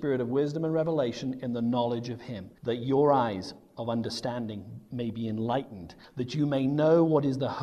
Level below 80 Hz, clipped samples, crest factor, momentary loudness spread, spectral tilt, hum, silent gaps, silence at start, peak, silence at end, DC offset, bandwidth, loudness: -64 dBFS; under 0.1%; 18 dB; 15 LU; -7.5 dB/octave; none; none; 0 s; -10 dBFS; 0 s; under 0.1%; 12.5 kHz; -29 LUFS